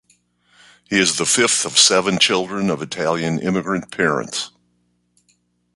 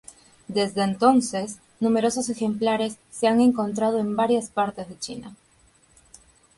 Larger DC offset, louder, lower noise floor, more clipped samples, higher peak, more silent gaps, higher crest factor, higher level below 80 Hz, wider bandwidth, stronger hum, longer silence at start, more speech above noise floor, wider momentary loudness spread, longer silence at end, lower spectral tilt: neither; first, -17 LUFS vs -23 LUFS; first, -65 dBFS vs -59 dBFS; neither; first, 0 dBFS vs -6 dBFS; neither; about the same, 20 dB vs 18 dB; first, -56 dBFS vs -62 dBFS; about the same, 11.5 kHz vs 11.5 kHz; first, 60 Hz at -45 dBFS vs none; first, 0.9 s vs 0.5 s; first, 47 dB vs 36 dB; second, 11 LU vs 14 LU; about the same, 1.25 s vs 1.25 s; second, -2.5 dB/octave vs -5 dB/octave